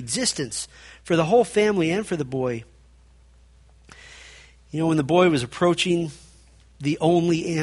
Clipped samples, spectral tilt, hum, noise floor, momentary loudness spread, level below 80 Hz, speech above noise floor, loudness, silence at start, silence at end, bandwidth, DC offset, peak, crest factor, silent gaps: under 0.1%; -5 dB/octave; none; -53 dBFS; 16 LU; -54 dBFS; 31 dB; -22 LUFS; 0 s; 0 s; 11.5 kHz; under 0.1%; -4 dBFS; 20 dB; none